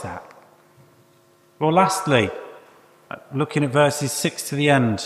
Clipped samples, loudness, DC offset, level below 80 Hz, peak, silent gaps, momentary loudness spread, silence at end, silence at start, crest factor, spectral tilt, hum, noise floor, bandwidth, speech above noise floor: under 0.1%; -20 LUFS; under 0.1%; -60 dBFS; -2 dBFS; none; 20 LU; 0 s; 0 s; 20 dB; -5 dB/octave; none; -56 dBFS; 15 kHz; 36 dB